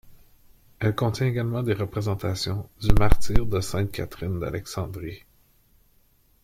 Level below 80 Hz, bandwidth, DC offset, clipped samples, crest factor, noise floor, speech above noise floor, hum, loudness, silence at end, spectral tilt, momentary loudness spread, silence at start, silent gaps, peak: -30 dBFS; 15.5 kHz; under 0.1%; under 0.1%; 20 dB; -61 dBFS; 40 dB; none; -27 LUFS; 1.25 s; -6 dB/octave; 9 LU; 0.1 s; none; -4 dBFS